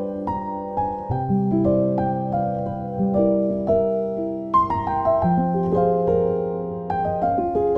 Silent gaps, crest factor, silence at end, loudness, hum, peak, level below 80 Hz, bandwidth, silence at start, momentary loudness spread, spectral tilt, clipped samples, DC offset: none; 14 dB; 0 s; -22 LUFS; none; -8 dBFS; -46 dBFS; 5.4 kHz; 0 s; 7 LU; -11 dB/octave; under 0.1%; under 0.1%